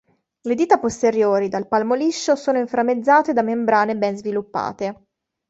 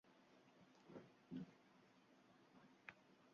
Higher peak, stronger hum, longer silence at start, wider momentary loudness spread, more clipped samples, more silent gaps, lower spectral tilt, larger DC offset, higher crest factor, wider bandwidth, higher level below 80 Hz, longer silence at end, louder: first, -2 dBFS vs -38 dBFS; neither; first, 0.45 s vs 0.05 s; first, 10 LU vs 7 LU; neither; neither; about the same, -5 dB/octave vs -5.5 dB/octave; neither; second, 18 dB vs 26 dB; first, 8.2 kHz vs 7 kHz; first, -60 dBFS vs under -90 dBFS; first, 0.55 s vs 0 s; first, -19 LUFS vs -60 LUFS